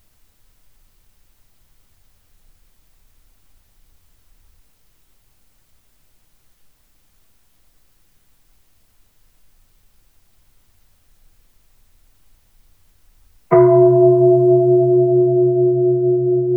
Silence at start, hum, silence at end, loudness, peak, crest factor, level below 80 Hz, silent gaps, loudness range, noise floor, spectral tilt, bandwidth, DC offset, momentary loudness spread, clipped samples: 13.5 s; none; 0 s; -13 LUFS; -2 dBFS; 18 dB; -56 dBFS; none; 6 LU; -59 dBFS; -11.5 dB/octave; 2.4 kHz; 0.1%; 5 LU; under 0.1%